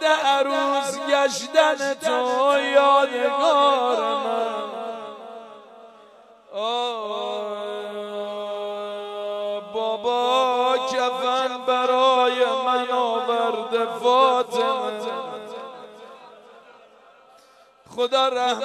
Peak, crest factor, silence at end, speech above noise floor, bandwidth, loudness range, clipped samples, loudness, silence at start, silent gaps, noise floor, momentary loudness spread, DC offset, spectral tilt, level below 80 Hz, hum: -4 dBFS; 18 dB; 0 s; 34 dB; 13.5 kHz; 10 LU; under 0.1%; -22 LUFS; 0 s; none; -53 dBFS; 14 LU; under 0.1%; -2 dB/octave; -78 dBFS; none